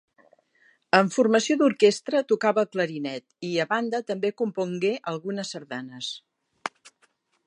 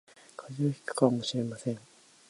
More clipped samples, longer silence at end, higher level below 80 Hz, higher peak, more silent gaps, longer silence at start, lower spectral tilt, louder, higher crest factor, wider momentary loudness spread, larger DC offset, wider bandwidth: neither; first, 0.8 s vs 0.5 s; second, -80 dBFS vs -74 dBFS; first, -2 dBFS vs -10 dBFS; neither; first, 0.95 s vs 0.4 s; second, -4.5 dB/octave vs -6 dB/octave; first, -25 LUFS vs -31 LUFS; about the same, 24 dB vs 22 dB; second, 15 LU vs 18 LU; neither; about the same, 11 kHz vs 11.5 kHz